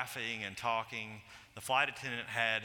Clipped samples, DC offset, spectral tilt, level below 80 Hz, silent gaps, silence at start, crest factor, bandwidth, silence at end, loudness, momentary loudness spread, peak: under 0.1%; under 0.1%; -2.5 dB/octave; -72 dBFS; none; 0 s; 22 dB; 18 kHz; 0 s; -35 LUFS; 15 LU; -16 dBFS